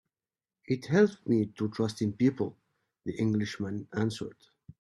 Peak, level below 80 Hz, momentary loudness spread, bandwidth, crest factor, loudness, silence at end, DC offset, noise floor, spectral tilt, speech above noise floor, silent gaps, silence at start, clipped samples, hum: -12 dBFS; -68 dBFS; 12 LU; 11.5 kHz; 20 dB; -30 LUFS; 0.5 s; under 0.1%; under -90 dBFS; -7 dB/octave; over 61 dB; none; 0.7 s; under 0.1%; none